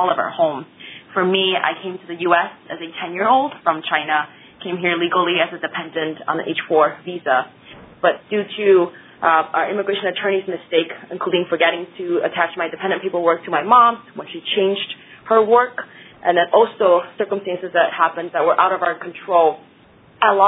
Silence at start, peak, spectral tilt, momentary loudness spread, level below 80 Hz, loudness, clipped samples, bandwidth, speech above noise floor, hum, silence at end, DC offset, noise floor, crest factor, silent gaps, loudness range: 0 s; 0 dBFS; -8 dB/octave; 13 LU; -66 dBFS; -18 LUFS; under 0.1%; 4 kHz; 31 dB; none; 0 s; under 0.1%; -49 dBFS; 18 dB; none; 3 LU